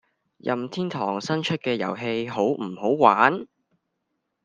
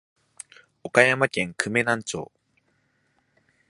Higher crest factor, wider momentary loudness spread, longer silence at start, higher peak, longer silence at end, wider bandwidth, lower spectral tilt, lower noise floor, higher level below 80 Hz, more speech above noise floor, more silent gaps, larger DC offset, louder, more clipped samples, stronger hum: about the same, 24 dB vs 26 dB; second, 11 LU vs 25 LU; second, 0.45 s vs 0.85 s; about the same, 0 dBFS vs 0 dBFS; second, 1 s vs 1.45 s; second, 9.6 kHz vs 11.5 kHz; first, -6 dB/octave vs -4 dB/octave; first, -78 dBFS vs -69 dBFS; second, -70 dBFS vs -64 dBFS; first, 54 dB vs 46 dB; neither; neither; about the same, -24 LUFS vs -22 LUFS; neither; neither